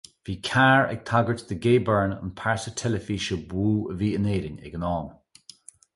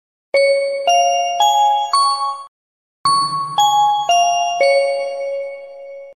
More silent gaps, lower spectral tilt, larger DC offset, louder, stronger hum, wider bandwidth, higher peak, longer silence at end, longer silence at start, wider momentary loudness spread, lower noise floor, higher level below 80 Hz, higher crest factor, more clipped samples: second, none vs 2.48-3.04 s; first, -6 dB/octave vs -0.5 dB/octave; second, under 0.1% vs 0.1%; second, -25 LUFS vs -16 LUFS; neither; second, 11.5 kHz vs 14 kHz; about the same, -6 dBFS vs -4 dBFS; first, 0.85 s vs 0.05 s; about the same, 0.25 s vs 0.35 s; about the same, 12 LU vs 12 LU; second, -50 dBFS vs under -90 dBFS; first, -46 dBFS vs -70 dBFS; first, 18 dB vs 12 dB; neither